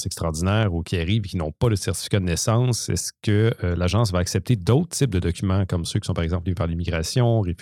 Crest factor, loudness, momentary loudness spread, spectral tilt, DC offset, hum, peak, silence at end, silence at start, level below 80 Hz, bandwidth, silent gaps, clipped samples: 18 dB; -23 LUFS; 5 LU; -5.5 dB/octave; under 0.1%; none; -4 dBFS; 0.05 s; 0 s; -42 dBFS; 16 kHz; none; under 0.1%